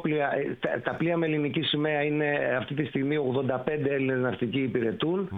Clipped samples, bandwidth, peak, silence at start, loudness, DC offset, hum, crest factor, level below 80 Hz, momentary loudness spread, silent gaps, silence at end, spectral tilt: under 0.1%; 4.5 kHz; -12 dBFS; 0 s; -27 LUFS; under 0.1%; none; 14 dB; -62 dBFS; 3 LU; none; 0 s; -9 dB/octave